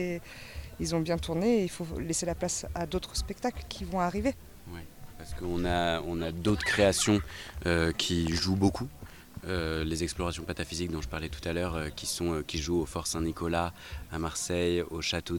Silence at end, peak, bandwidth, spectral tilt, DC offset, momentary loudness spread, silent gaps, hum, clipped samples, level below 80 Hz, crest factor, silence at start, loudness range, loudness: 0 s; -12 dBFS; 19 kHz; -4.5 dB/octave; under 0.1%; 14 LU; none; none; under 0.1%; -44 dBFS; 20 dB; 0 s; 5 LU; -31 LUFS